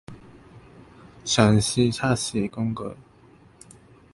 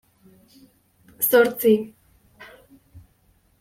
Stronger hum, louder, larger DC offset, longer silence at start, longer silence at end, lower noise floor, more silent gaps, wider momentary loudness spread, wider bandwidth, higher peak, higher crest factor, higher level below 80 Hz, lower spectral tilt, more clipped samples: neither; second, -23 LUFS vs -19 LUFS; neither; second, 0.1 s vs 1.2 s; first, 1.1 s vs 0.6 s; second, -53 dBFS vs -62 dBFS; neither; first, 15 LU vs 8 LU; second, 11.5 kHz vs 16.5 kHz; about the same, -4 dBFS vs -4 dBFS; about the same, 22 dB vs 20 dB; first, -50 dBFS vs -64 dBFS; about the same, -5 dB/octave vs -4 dB/octave; neither